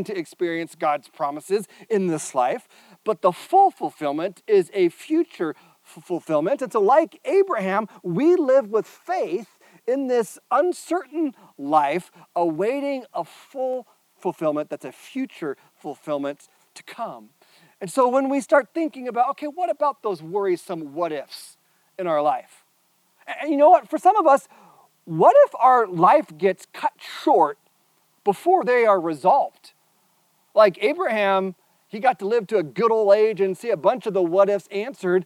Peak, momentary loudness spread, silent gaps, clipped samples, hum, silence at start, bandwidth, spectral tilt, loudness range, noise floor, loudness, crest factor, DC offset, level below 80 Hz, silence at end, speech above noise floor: -4 dBFS; 15 LU; none; under 0.1%; none; 0 s; 15 kHz; -5.5 dB/octave; 9 LU; -64 dBFS; -22 LUFS; 18 dB; under 0.1%; -84 dBFS; 0 s; 43 dB